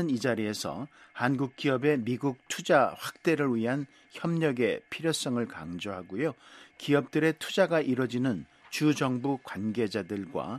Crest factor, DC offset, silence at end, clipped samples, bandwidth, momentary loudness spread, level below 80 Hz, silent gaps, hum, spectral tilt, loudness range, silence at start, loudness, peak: 20 dB; under 0.1%; 0 s; under 0.1%; 13.5 kHz; 11 LU; -70 dBFS; none; none; -5.5 dB/octave; 2 LU; 0 s; -29 LUFS; -8 dBFS